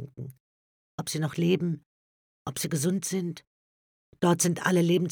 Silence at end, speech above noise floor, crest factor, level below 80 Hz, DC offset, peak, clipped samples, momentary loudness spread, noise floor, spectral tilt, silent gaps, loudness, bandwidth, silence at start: 0 s; over 64 dB; 22 dB; -70 dBFS; under 0.1%; -8 dBFS; under 0.1%; 18 LU; under -90 dBFS; -5 dB/octave; 0.40-0.98 s, 1.86-2.45 s, 3.47-4.12 s; -28 LUFS; 19 kHz; 0 s